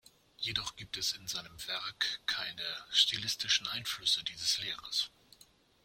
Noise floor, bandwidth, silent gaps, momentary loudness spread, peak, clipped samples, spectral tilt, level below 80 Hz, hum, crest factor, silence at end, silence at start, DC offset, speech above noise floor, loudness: -64 dBFS; 16.5 kHz; none; 11 LU; -12 dBFS; under 0.1%; 0.5 dB/octave; -66 dBFS; none; 24 dB; 0.75 s; 0.4 s; under 0.1%; 28 dB; -33 LUFS